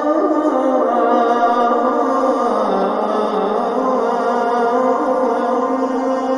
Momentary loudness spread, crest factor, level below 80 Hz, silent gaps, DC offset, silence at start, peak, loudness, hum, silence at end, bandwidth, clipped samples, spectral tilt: 3 LU; 14 dB; -60 dBFS; none; under 0.1%; 0 s; -2 dBFS; -16 LUFS; none; 0 s; 10.5 kHz; under 0.1%; -6 dB/octave